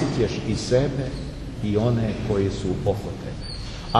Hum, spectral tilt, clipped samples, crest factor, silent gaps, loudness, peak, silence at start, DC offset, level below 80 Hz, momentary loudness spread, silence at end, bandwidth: none; -6.5 dB/octave; under 0.1%; 20 dB; none; -25 LUFS; -4 dBFS; 0 s; under 0.1%; -36 dBFS; 11 LU; 0 s; 12 kHz